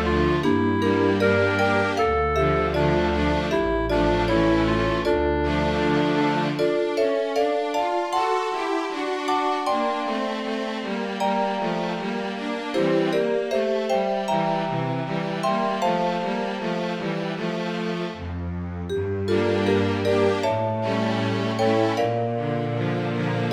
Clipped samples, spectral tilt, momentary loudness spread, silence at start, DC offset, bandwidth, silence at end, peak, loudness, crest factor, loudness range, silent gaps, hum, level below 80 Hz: under 0.1%; -6.5 dB/octave; 6 LU; 0 s; under 0.1%; 14 kHz; 0 s; -8 dBFS; -23 LUFS; 14 dB; 4 LU; none; none; -40 dBFS